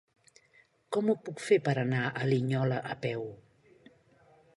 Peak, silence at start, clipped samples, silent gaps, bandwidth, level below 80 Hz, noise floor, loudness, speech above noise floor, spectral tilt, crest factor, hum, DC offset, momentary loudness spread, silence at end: -12 dBFS; 0.9 s; under 0.1%; none; 11.5 kHz; -72 dBFS; -65 dBFS; -31 LUFS; 36 dB; -7 dB/octave; 20 dB; none; under 0.1%; 8 LU; 1.15 s